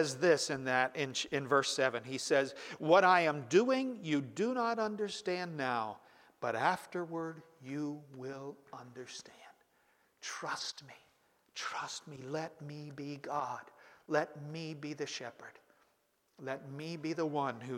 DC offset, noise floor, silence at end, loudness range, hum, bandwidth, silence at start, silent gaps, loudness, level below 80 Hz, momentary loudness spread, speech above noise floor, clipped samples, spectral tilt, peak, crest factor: under 0.1%; -76 dBFS; 0 s; 14 LU; none; 16 kHz; 0 s; none; -35 LUFS; -82 dBFS; 18 LU; 41 dB; under 0.1%; -4 dB/octave; -14 dBFS; 22 dB